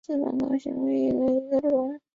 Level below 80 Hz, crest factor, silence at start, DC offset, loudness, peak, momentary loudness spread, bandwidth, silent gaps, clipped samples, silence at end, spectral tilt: -62 dBFS; 12 dB; 0.1 s; under 0.1%; -26 LUFS; -14 dBFS; 4 LU; 7.2 kHz; none; under 0.1%; 0.15 s; -8.5 dB/octave